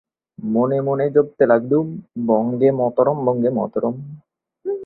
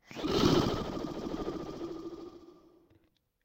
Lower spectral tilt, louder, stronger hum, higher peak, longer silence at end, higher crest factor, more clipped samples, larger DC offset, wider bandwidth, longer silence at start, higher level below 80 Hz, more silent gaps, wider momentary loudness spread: first, -12.5 dB/octave vs -5.5 dB/octave; first, -19 LUFS vs -33 LUFS; neither; first, -2 dBFS vs -14 dBFS; second, 0 s vs 0.9 s; about the same, 16 dB vs 20 dB; neither; neither; second, 4.1 kHz vs 16 kHz; first, 0.4 s vs 0.1 s; second, -62 dBFS vs -50 dBFS; neither; second, 12 LU vs 18 LU